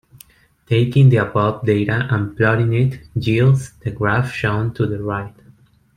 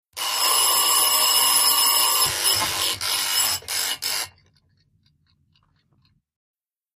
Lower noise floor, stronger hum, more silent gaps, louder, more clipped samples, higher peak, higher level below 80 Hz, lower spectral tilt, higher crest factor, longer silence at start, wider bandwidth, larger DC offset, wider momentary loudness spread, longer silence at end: second, -50 dBFS vs -64 dBFS; neither; neither; about the same, -18 LUFS vs -18 LUFS; neither; first, -2 dBFS vs -6 dBFS; first, -46 dBFS vs -60 dBFS; first, -8 dB/octave vs 1.5 dB/octave; about the same, 16 dB vs 18 dB; first, 0.7 s vs 0.15 s; second, 10.5 kHz vs 15 kHz; neither; about the same, 11 LU vs 9 LU; second, 0.7 s vs 2.7 s